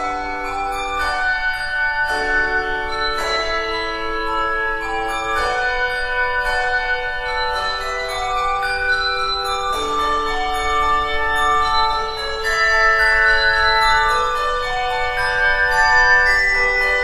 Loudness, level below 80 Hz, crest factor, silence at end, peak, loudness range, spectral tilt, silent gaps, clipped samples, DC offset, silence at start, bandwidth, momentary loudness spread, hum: -17 LUFS; -32 dBFS; 16 dB; 0 s; -2 dBFS; 5 LU; -2 dB/octave; none; under 0.1%; under 0.1%; 0 s; 13.5 kHz; 9 LU; none